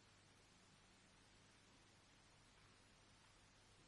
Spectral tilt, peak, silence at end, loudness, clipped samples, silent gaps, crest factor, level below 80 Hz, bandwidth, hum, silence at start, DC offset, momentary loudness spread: -3 dB/octave; -58 dBFS; 0 s; -70 LUFS; under 0.1%; none; 12 dB; -82 dBFS; 11 kHz; none; 0 s; under 0.1%; 0 LU